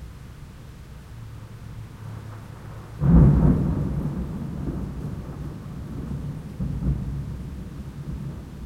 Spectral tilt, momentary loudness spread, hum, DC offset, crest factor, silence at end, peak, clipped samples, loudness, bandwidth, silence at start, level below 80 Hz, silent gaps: -9.5 dB/octave; 22 LU; none; under 0.1%; 20 dB; 0 s; -6 dBFS; under 0.1%; -25 LUFS; 11 kHz; 0 s; -32 dBFS; none